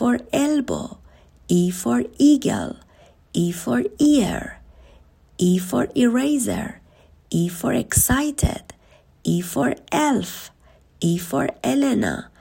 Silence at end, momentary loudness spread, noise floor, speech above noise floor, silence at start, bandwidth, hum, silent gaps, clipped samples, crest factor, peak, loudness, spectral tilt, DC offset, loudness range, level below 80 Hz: 0.15 s; 13 LU; -54 dBFS; 33 dB; 0 s; 16.5 kHz; none; none; under 0.1%; 20 dB; -2 dBFS; -21 LUFS; -5 dB/octave; under 0.1%; 3 LU; -42 dBFS